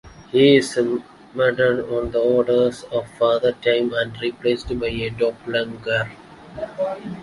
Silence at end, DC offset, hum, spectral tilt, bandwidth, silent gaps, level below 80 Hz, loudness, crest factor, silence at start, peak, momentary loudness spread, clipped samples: 0 s; under 0.1%; none; -5.5 dB/octave; 11.5 kHz; none; -46 dBFS; -20 LUFS; 18 dB; 0.05 s; -2 dBFS; 10 LU; under 0.1%